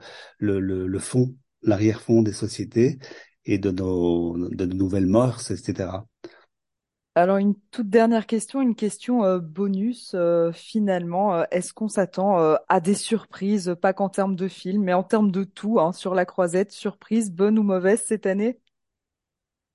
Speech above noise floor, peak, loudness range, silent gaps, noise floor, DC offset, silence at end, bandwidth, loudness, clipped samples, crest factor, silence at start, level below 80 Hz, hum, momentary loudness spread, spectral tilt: 64 dB; -6 dBFS; 2 LU; none; -86 dBFS; under 0.1%; 1.2 s; 11.5 kHz; -23 LUFS; under 0.1%; 18 dB; 0.05 s; -50 dBFS; none; 8 LU; -6.5 dB/octave